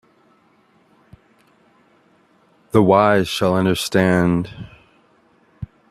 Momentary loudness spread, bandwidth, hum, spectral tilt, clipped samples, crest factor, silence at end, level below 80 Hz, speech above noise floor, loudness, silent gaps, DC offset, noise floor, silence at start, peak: 24 LU; 14.5 kHz; none; -6 dB/octave; under 0.1%; 20 dB; 0.25 s; -50 dBFS; 41 dB; -17 LUFS; none; under 0.1%; -57 dBFS; 2.75 s; 0 dBFS